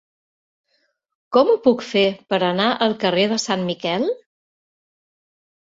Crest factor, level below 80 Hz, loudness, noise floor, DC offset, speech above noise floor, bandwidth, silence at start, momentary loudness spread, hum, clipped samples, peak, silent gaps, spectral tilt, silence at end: 18 dB; -64 dBFS; -19 LUFS; -68 dBFS; under 0.1%; 50 dB; 7.8 kHz; 1.3 s; 6 LU; none; under 0.1%; -2 dBFS; none; -4.5 dB/octave; 1.5 s